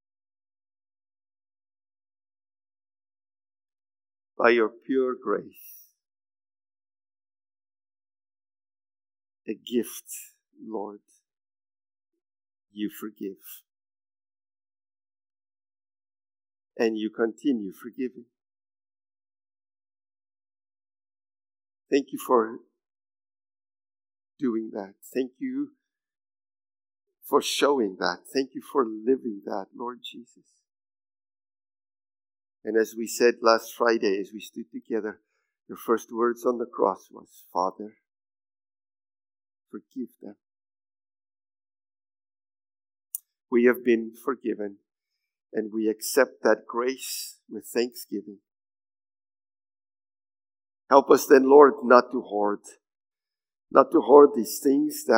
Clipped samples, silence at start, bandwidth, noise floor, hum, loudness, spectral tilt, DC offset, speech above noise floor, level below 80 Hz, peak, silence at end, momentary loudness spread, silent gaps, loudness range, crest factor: under 0.1%; 4.4 s; 16 kHz; under -90 dBFS; none; -24 LUFS; -4 dB/octave; under 0.1%; over 66 dB; under -90 dBFS; -2 dBFS; 0 s; 20 LU; none; 21 LU; 26 dB